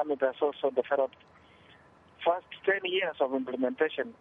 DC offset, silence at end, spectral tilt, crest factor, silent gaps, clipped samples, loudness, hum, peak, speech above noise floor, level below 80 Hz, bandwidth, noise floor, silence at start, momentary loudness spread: under 0.1%; 0.1 s; -6.5 dB/octave; 18 dB; none; under 0.1%; -30 LUFS; none; -14 dBFS; 28 dB; -76 dBFS; 4.1 kHz; -58 dBFS; 0 s; 3 LU